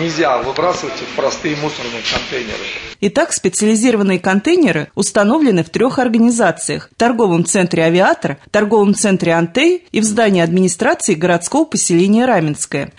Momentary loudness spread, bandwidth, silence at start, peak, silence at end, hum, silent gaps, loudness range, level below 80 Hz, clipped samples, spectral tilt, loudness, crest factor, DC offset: 8 LU; 11 kHz; 0 s; -2 dBFS; 0.1 s; none; none; 3 LU; -50 dBFS; under 0.1%; -4.5 dB/octave; -14 LUFS; 12 dB; under 0.1%